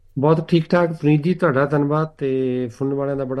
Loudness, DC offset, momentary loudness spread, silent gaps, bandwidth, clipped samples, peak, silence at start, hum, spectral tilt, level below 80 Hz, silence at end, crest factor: -19 LUFS; under 0.1%; 6 LU; none; 9 kHz; under 0.1%; -2 dBFS; 0.15 s; none; -9 dB/octave; -54 dBFS; 0 s; 16 dB